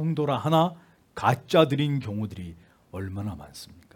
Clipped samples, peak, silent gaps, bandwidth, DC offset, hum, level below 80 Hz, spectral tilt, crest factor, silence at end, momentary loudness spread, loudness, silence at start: under 0.1%; -4 dBFS; none; 17.5 kHz; under 0.1%; none; -60 dBFS; -7 dB/octave; 22 dB; 0.2 s; 21 LU; -26 LUFS; 0 s